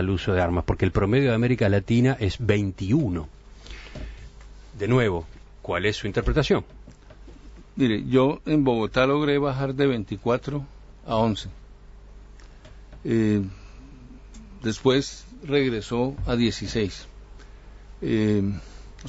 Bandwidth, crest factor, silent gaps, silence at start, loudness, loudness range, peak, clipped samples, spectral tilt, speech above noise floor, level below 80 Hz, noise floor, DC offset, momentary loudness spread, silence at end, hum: 8 kHz; 18 dB; none; 0 s; -24 LUFS; 6 LU; -6 dBFS; under 0.1%; -7 dB/octave; 23 dB; -40 dBFS; -45 dBFS; under 0.1%; 19 LU; 0 s; none